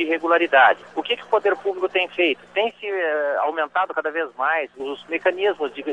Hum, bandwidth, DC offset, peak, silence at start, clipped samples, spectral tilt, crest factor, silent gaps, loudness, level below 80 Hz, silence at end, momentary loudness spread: 60 Hz at -70 dBFS; 9 kHz; under 0.1%; -4 dBFS; 0 s; under 0.1%; -4 dB/octave; 18 dB; none; -21 LUFS; -72 dBFS; 0 s; 9 LU